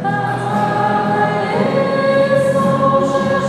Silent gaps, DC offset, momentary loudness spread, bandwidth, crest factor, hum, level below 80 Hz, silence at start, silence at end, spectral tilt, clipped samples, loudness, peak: none; under 0.1%; 4 LU; 12.5 kHz; 14 dB; none; -52 dBFS; 0 s; 0 s; -6.5 dB/octave; under 0.1%; -15 LUFS; -2 dBFS